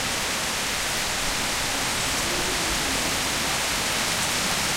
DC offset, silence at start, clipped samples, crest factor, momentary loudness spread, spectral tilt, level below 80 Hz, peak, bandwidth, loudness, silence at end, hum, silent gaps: under 0.1%; 0 s; under 0.1%; 16 dB; 2 LU; -1 dB/octave; -42 dBFS; -10 dBFS; 16 kHz; -23 LUFS; 0 s; none; none